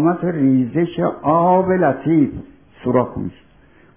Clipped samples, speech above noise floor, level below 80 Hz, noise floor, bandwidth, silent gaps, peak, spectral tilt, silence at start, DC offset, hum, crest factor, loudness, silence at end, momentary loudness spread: under 0.1%; 34 dB; -48 dBFS; -50 dBFS; 3.6 kHz; none; -2 dBFS; -12.5 dB/octave; 0 s; 0.2%; none; 16 dB; -17 LUFS; 0.65 s; 12 LU